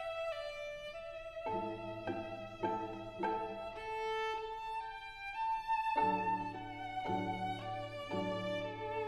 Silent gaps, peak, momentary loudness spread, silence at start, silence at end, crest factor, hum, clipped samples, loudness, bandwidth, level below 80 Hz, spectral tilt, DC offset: none; -22 dBFS; 10 LU; 0 s; 0 s; 18 dB; none; under 0.1%; -40 LUFS; 12.5 kHz; -62 dBFS; -6 dB/octave; under 0.1%